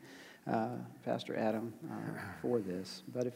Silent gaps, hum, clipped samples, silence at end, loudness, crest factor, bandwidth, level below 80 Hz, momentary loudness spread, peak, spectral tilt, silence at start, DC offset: none; none; under 0.1%; 0 s; -39 LUFS; 18 dB; 16 kHz; -78 dBFS; 8 LU; -20 dBFS; -6.5 dB/octave; 0 s; under 0.1%